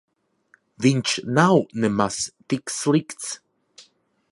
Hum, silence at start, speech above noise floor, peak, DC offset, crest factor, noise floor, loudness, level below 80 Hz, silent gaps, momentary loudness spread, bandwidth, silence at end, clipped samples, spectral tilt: none; 0.8 s; 40 dB; -2 dBFS; under 0.1%; 22 dB; -61 dBFS; -22 LUFS; -60 dBFS; none; 14 LU; 11.5 kHz; 0.5 s; under 0.1%; -5 dB/octave